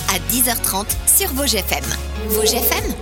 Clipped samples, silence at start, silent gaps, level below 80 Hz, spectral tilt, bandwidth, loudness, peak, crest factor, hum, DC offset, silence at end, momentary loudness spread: under 0.1%; 0 s; none; -28 dBFS; -2.5 dB/octave; 19 kHz; -16 LUFS; 0 dBFS; 18 dB; none; under 0.1%; 0 s; 7 LU